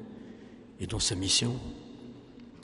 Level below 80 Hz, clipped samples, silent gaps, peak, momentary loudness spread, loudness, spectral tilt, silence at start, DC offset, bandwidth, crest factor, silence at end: -50 dBFS; under 0.1%; none; -14 dBFS; 24 LU; -28 LUFS; -3 dB/octave; 0 s; under 0.1%; 11.5 kHz; 22 dB; 0 s